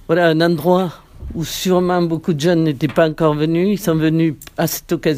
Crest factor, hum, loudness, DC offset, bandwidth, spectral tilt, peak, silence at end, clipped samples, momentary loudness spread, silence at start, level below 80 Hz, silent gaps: 16 dB; none; -17 LUFS; under 0.1%; 16 kHz; -6 dB/octave; -2 dBFS; 0 s; under 0.1%; 8 LU; 0.1 s; -42 dBFS; none